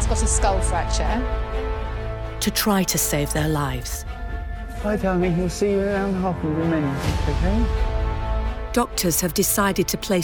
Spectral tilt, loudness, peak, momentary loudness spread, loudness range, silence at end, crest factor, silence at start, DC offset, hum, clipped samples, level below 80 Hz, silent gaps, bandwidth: -4.5 dB/octave; -23 LUFS; -4 dBFS; 10 LU; 1 LU; 0 s; 16 dB; 0 s; under 0.1%; none; under 0.1%; -28 dBFS; none; over 20 kHz